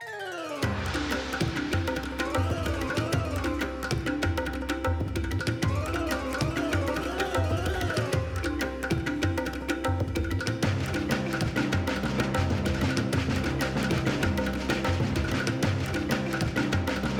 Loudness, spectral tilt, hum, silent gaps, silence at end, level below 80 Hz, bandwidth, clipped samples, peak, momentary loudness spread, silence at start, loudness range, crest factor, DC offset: -29 LUFS; -5.5 dB/octave; none; none; 0 s; -38 dBFS; 19 kHz; under 0.1%; -12 dBFS; 3 LU; 0 s; 2 LU; 16 dB; under 0.1%